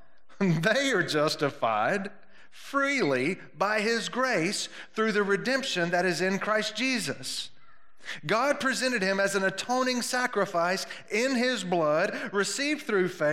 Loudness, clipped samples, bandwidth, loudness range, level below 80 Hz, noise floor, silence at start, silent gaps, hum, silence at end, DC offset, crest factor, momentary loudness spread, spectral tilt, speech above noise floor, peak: -27 LUFS; under 0.1%; 16 kHz; 1 LU; -74 dBFS; -61 dBFS; 0 s; none; none; 0 s; 0.3%; 18 dB; 7 LU; -4 dB/octave; 34 dB; -10 dBFS